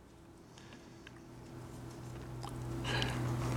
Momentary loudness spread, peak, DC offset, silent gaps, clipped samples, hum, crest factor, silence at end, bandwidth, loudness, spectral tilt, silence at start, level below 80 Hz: 19 LU; -18 dBFS; under 0.1%; none; under 0.1%; none; 22 dB; 0 s; 16.5 kHz; -41 LUFS; -5 dB/octave; 0 s; -54 dBFS